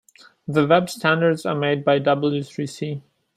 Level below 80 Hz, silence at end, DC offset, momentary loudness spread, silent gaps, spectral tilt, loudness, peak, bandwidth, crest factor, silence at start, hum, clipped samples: -64 dBFS; 0.35 s; under 0.1%; 12 LU; none; -6 dB/octave; -21 LUFS; -2 dBFS; 15 kHz; 18 dB; 0.5 s; none; under 0.1%